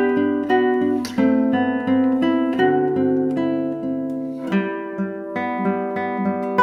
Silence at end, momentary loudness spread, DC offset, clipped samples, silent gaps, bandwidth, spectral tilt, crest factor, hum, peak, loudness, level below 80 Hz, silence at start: 0 s; 8 LU; under 0.1%; under 0.1%; none; 11 kHz; -7.5 dB/octave; 16 dB; none; -4 dBFS; -21 LUFS; -64 dBFS; 0 s